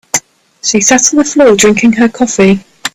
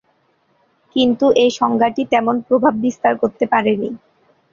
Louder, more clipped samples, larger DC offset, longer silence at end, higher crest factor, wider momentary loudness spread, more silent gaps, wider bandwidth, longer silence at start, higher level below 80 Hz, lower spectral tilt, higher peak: first, -8 LUFS vs -16 LUFS; first, 0.2% vs under 0.1%; neither; second, 0.05 s vs 0.55 s; about the same, 10 dB vs 14 dB; about the same, 9 LU vs 8 LU; neither; first, over 20 kHz vs 7.4 kHz; second, 0.15 s vs 0.95 s; first, -44 dBFS vs -58 dBFS; second, -3.5 dB/octave vs -5 dB/octave; about the same, 0 dBFS vs -2 dBFS